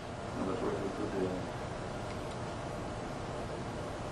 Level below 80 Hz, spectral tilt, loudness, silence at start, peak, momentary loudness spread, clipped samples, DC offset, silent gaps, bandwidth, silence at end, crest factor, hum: -52 dBFS; -6 dB/octave; -38 LUFS; 0 s; -22 dBFS; 5 LU; under 0.1%; under 0.1%; none; 12 kHz; 0 s; 16 dB; none